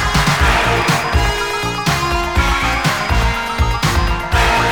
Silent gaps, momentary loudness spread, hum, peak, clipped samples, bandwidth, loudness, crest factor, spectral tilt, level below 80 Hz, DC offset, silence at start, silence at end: none; 5 LU; none; -2 dBFS; under 0.1%; over 20 kHz; -15 LUFS; 14 dB; -4 dB/octave; -20 dBFS; 0.7%; 0 s; 0 s